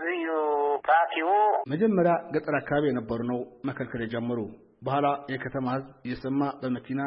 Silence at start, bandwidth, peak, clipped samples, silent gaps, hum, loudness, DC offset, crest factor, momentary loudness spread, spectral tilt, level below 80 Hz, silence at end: 0 s; 5.6 kHz; -10 dBFS; under 0.1%; none; none; -27 LUFS; under 0.1%; 16 dB; 11 LU; -11 dB/octave; -60 dBFS; 0 s